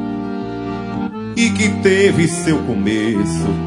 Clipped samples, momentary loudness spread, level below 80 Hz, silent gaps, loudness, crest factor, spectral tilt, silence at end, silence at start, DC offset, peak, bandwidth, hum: under 0.1%; 11 LU; -44 dBFS; none; -17 LUFS; 16 dB; -5.5 dB/octave; 0 s; 0 s; under 0.1%; 0 dBFS; 11 kHz; none